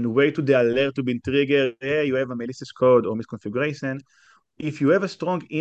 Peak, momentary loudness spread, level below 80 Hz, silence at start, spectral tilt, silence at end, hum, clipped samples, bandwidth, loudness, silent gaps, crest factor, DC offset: -6 dBFS; 12 LU; -58 dBFS; 0 s; -7 dB/octave; 0 s; none; under 0.1%; 8.2 kHz; -22 LUFS; none; 16 dB; under 0.1%